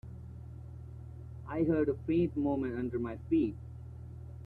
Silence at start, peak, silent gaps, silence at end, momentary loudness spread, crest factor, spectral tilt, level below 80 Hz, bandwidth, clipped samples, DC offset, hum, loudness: 0.05 s; -18 dBFS; none; 0 s; 17 LU; 16 dB; -10.5 dB/octave; -54 dBFS; 4.3 kHz; under 0.1%; under 0.1%; none; -33 LUFS